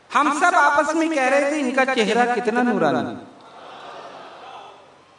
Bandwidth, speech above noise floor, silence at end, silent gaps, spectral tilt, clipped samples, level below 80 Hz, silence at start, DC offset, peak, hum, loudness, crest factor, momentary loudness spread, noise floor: 11 kHz; 28 dB; 0.5 s; none; -4 dB/octave; under 0.1%; -70 dBFS; 0.1 s; under 0.1%; -4 dBFS; none; -19 LUFS; 18 dB; 22 LU; -47 dBFS